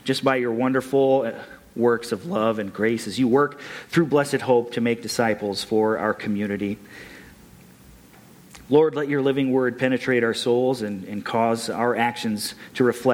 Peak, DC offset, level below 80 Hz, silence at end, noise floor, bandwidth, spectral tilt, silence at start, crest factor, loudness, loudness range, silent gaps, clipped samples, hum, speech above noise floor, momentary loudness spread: -6 dBFS; under 0.1%; -60 dBFS; 0 s; -49 dBFS; 16.5 kHz; -5.5 dB/octave; 0.05 s; 16 dB; -22 LUFS; 4 LU; none; under 0.1%; none; 27 dB; 9 LU